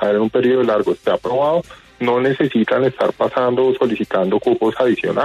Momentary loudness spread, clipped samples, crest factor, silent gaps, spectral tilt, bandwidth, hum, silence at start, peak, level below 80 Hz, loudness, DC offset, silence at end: 3 LU; under 0.1%; 12 dB; none; -7.5 dB/octave; 10 kHz; none; 0 s; -4 dBFS; -56 dBFS; -17 LUFS; under 0.1%; 0 s